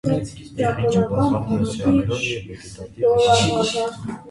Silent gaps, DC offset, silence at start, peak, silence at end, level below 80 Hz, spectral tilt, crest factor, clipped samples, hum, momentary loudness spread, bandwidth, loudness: none; under 0.1%; 0.05 s; -4 dBFS; 0 s; -42 dBFS; -5.5 dB/octave; 16 dB; under 0.1%; none; 16 LU; 11.5 kHz; -20 LUFS